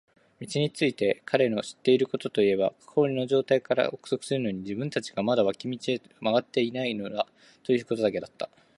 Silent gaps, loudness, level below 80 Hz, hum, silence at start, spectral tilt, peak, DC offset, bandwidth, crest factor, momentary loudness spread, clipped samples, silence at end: none; -27 LUFS; -68 dBFS; none; 0.4 s; -5.5 dB/octave; -8 dBFS; under 0.1%; 11.5 kHz; 20 dB; 8 LU; under 0.1%; 0.3 s